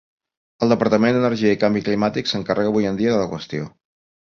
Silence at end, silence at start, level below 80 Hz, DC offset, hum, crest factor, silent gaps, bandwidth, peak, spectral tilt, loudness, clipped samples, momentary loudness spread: 0.65 s; 0.6 s; -54 dBFS; under 0.1%; none; 18 dB; none; 7.2 kHz; -2 dBFS; -6.5 dB/octave; -20 LUFS; under 0.1%; 11 LU